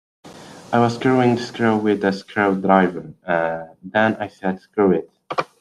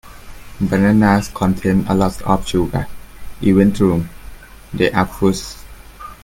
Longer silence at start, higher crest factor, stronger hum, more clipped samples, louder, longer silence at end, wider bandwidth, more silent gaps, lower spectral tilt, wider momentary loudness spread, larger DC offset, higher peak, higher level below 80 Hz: first, 0.25 s vs 0.05 s; about the same, 18 dB vs 16 dB; neither; neither; second, -20 LUFS vs -16 LUFS; about the same, 0.15 s vs 0.1 s; second, 11.5 kHz vs 16.5 kHz; neither; about the same, -7 dB/octave vs -6.5 dB/octave; second, 10 LU vs 18 LU; neither; about the same, -2 dBFS vs 0 dBFS; second, -60 dBFS vs -34 dBFS